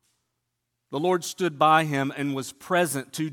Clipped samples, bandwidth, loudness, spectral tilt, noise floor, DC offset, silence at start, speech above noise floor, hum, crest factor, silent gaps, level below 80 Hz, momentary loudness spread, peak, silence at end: under 0.1%; 17.5 kHz; -25 LUFS; -4.5 dB/octave; -80 dBFS; under 0.1%; 0.9 s; 55 dB; none; 20 dB; none; -74 dBFS; 10 LU; -6 dBFS; 0 s